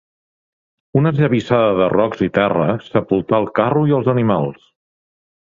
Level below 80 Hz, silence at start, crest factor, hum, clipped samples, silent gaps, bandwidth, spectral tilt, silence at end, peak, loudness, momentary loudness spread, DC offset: -50 dBFS; 0.95 s; 16 dB; none; under 0.1%; none; 7.2 kHz; -9 dB/octave; 0.95 s; -2 dBFS; -17 LUFS; 4 LU; under 0.1%